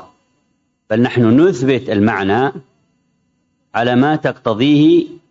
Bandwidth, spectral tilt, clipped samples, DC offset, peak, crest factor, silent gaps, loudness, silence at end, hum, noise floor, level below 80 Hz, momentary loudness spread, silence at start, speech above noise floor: 7.8 kHz; -7.5 dB/octave; under 0.1%; under 0.1%; -2 dBFS; 12 dB; none; -14 LUFS; 0.15 s; none; -65 dBFS; -56 dBFS; 8 LU; 0.9 s; 51 dB